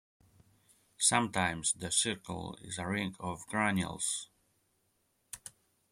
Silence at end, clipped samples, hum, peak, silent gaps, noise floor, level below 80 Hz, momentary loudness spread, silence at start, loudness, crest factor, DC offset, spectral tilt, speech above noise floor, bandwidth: 0.45 s; under 0.1%; none; -12 dBFS; none; -76 dBFS; -66 dBFS; 19 LU; 1 s; -32 LUFS; 24 dB; under 0.1%; -2.5 dB/octave; 43 dB; 16 kHz